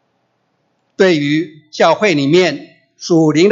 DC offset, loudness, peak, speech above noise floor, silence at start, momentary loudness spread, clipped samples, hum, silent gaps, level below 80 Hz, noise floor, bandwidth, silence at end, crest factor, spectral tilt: under 0.1%; -13 LUFS; 0 dBFS; 51 dB; 1 s; 13 LU; under 0.1%; none; none; -62 dBFS; -64 dBFS; 7.8 kHz; 0 s; 14 dB; -5.5 dB/octave